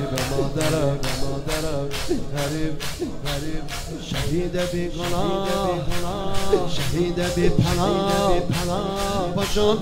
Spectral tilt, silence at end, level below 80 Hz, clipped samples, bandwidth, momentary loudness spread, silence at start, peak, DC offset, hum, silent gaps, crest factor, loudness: -5 dB/octave; 0 s; -32 dBFS; under 0.1%; 16 kHz; 8 LU; 0 s; -2 dBFS; under 0.1%; none; none; 20 dB; -24 LUFS